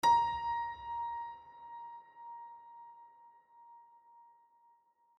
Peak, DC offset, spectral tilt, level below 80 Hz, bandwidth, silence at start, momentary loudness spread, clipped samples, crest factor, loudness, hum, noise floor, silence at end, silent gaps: -18 dBFS; under 0.1%; -2 dB/octave; -68 dBFS; 11.5 kHz; 0.05 s; 25 LU; under 0.1%; 20 dB; -37 LUFS; none; -70 dBFS; 0.95 s; none